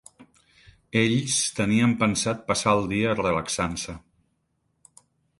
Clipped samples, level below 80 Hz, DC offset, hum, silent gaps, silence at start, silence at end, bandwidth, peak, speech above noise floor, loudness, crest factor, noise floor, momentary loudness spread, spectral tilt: under 0.1%; -52 dBFS; under 0.1%; none; none; 0.2 s; 1.4 s; 11.5 kHz; -6 dBFS; 49 dB; -24 LUFS; 20 dB; -73 dBFS; 7 LU; -4 dB/octave